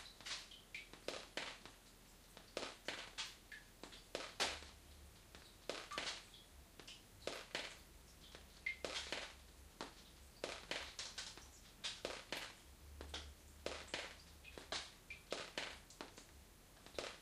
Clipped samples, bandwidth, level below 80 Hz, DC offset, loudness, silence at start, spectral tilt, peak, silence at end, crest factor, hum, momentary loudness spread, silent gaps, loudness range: under 0.1%; 15.5 kHz; -66 dBFS; under 0.1%; -49 LUFS; 0 s; -1.5 dB/octave; -22 dBFS; 0 s; 28 dB; none; 15 LU; none; 2 LU